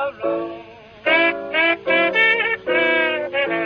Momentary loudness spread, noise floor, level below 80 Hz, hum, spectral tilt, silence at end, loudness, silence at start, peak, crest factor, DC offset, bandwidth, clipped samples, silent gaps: 10 LU; -40 dBFS; -60 dBFS; none; -5.5 dB/octave; 0 s; -18 LUFS; 0 s; -4 dBFS; 16 dB; under 0.1%; 6.4 kHz; under 0.1%; none